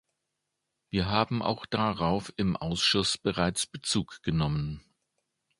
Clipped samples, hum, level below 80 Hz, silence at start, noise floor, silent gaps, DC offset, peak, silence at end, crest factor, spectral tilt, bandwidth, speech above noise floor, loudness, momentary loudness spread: under 0.1%; none; -50 dBFS; 0.95 s; -83 dBFS; none; under 0.1%; -8 dBFS; 0.8 s; 22 dB; -4.5 dB/octave; 11.5 kHz; 54 dB; -29 LUFS; 7 LU